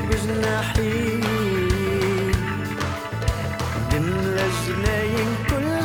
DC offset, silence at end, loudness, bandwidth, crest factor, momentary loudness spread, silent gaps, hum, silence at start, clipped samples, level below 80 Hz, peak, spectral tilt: under 0.1%; 0 s; -23 LUFS; over 20 kHz; 14 dB; 4 LU; none; none; 0 s; under 0.1%; -32 dBFS; -8 dBFS; -5.5 dB/octave